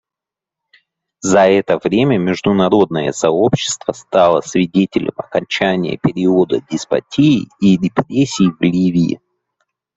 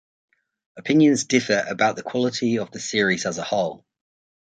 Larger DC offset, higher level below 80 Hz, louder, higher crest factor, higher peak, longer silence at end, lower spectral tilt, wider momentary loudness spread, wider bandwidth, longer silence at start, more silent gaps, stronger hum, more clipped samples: neither; first, -52 dBFS vs -64 dBFS; first, -15 LUFS vs -21 LUFS; about the same, 14 dB vs 18 dB; about the same, -2 dBFS vs -4 dBFS; about the same, 0.8 s vs 0.85 s; first, -5.5 dB/octave vs -4 dB/octave; about the same, 7 LU vs 8 LU; second, 8 kHz vs 9.4 kHz; first, 1.25 s vs 0.75 s; neither; neither; neither